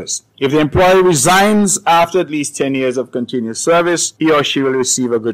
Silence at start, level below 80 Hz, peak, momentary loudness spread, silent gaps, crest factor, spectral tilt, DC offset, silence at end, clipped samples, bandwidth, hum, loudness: 0 s; -42 dBFS; -4 dBFS; 9 LU; none; 10 dB; -3.5 dB/octave; under 0.1%; 0 s; under 0.1%; 16 kHz; none; -13 LUFS